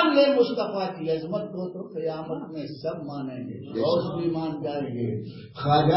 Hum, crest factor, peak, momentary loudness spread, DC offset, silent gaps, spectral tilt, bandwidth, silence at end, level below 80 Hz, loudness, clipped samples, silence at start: none; 18 dB; -8 dBFS; 12 LU; under 0.1%; none; -10.5 dB/octave; 5.8 kHz; 0 s; -58 dBFS; -27 LUFS; under 0.1%; 0 s